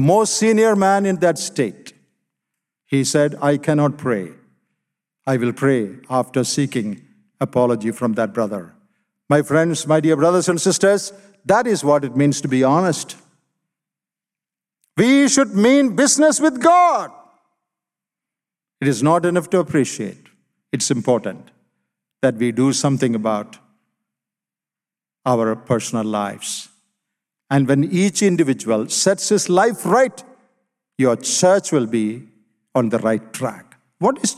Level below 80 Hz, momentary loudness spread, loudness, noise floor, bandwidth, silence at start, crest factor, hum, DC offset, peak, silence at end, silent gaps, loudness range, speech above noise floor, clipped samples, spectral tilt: -66 dBFS; 12 LU; -18 LUFS; under -90 dBFS; 14.5 kHz; 0 s; 18 dB; none; under 0.1%; -2 dBFS; 0.05 s; none; 6 LU; over 73 dB; under 0.1%; -5 dB/octave